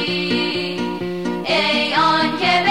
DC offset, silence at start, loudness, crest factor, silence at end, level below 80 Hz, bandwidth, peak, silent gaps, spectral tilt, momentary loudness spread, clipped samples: 0.5%; 0 s; -18 LUFS; 14 dB; 0 s; -54 dBFS; 16 kHz; -6 dBFS; none; -4.5 dB/octave; 8 LU; under 0.1%